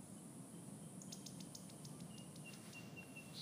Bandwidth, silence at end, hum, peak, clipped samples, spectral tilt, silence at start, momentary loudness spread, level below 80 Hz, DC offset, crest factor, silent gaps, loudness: 15.5 kHz; 0 s; none; -36 dBFS; under 0.1%; -4 dB/octave; 0 s; 3 LU; -84 dBFS; under 0.1%; 18 dB; none; -54 LUFS